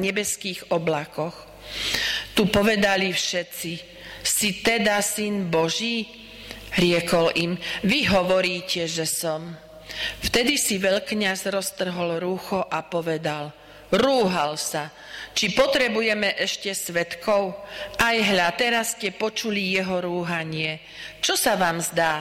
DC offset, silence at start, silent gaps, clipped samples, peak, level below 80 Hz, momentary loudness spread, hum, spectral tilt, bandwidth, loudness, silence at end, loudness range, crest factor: under 0.1%; 0 s; none; under 0.1%; -10 dBFS; -50 dBFS; 12 LU; none; -3 dB/octave; 16.5 kHz; -23 LUFS; 0 s; 2 LU; 14 dB